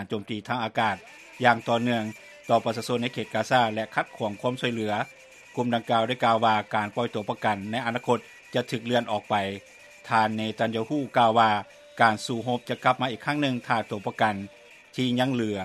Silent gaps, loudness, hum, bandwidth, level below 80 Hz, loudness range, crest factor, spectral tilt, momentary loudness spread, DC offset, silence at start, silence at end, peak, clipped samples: none; -26 LUFS; none; 14 kHz; -70 dBFS; 3 LU; 24 dB; -5.5 dB/octave; 10 LU; under 0.1%; 0 s; 0 s; -4 dBFS; under 0.1%